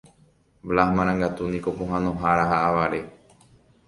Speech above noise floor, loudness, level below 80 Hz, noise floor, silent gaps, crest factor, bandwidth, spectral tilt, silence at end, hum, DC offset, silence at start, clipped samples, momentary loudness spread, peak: 37 dB; -23 LUFS; -46 dBFS; -59 dBFS; none; 20 dB; 11.5 kHz; -7.5 dB/octave; 0.75 s; none; under 0.1%; 0.65 s; under 0.1%; 9 LU; -4 dBFS